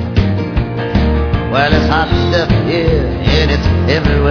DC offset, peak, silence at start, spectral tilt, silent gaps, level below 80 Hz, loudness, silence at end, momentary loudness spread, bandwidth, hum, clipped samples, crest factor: under 0.1%; 0 dBFS; 0 s; -7 dB/octave; none; -18 dBFS; -13 LUFS; 0 s; 4 LU; 5.4 kHz; none; under 0.1%; 12 dB